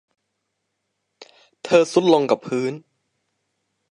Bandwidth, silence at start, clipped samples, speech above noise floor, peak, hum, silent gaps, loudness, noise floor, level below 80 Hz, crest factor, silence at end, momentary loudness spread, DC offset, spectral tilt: 11 kHz; 1.65 s; under 0.1%; 58 dB; -2 dBFS; none; none; -19 LUFS; -76 dBFS; -72 dBFS; 20 dB; 1.15 s; 18 LU; under 0.1%; -5.5 dB/octave